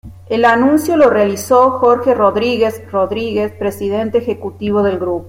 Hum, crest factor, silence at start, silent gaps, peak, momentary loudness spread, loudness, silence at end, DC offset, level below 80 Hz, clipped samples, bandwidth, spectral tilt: none; 12 dB; 0.05 s; none; -2 dBFS; 8 LU; -14 LUFS; 0 s; under 0.1%; -48 dBFS; under 0.1%; 16.5 kHz; -5.5 dB/octave